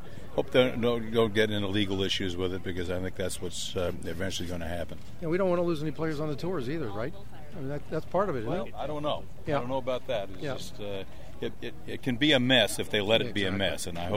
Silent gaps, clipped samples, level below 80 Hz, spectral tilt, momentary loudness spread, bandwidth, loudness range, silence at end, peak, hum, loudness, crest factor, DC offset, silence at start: none; under 0.1%; -50 dBFS; -5 dB/octave; 13 LU; 16 kHz; 6 LU; 0 s; -8 dBFS; none; -30 LUFS; 20 dB; 2%; 0 s